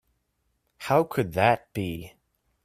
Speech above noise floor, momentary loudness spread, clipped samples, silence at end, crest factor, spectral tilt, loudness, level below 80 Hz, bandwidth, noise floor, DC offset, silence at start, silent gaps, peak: 50 dB; 14 LU; under 0.1%; 0.55 s; 22 dB; -6.5 dB/octave; -25 LUFS; -58 dBFS; 16 kHz; -74 dBFS; under 0.1%; 0.8 s; none; -6 dBFS